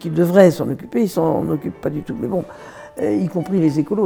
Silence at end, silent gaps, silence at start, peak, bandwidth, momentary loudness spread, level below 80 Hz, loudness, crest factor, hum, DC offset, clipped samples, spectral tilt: 0 s; none; 0 s; 0 dBFS; over 20 kHz; 13 LU; -54 dBFS; -18 LUFS; 18 dB; none; under 0.1%; under 0.1%; -8 dB/octave